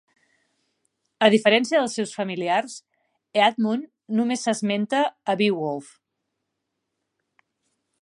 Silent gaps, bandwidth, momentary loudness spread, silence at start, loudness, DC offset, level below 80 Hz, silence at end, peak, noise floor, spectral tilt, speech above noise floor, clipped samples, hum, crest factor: none; 11 kHz; 10 LU; 1.2 s; -22 LUFS; under 0.1%; -78 dBFS; 2.2 s; -2 dBFS; -80 dBFS; -4 dB/octave; 58 dB; under 0.1%; none; 24 dB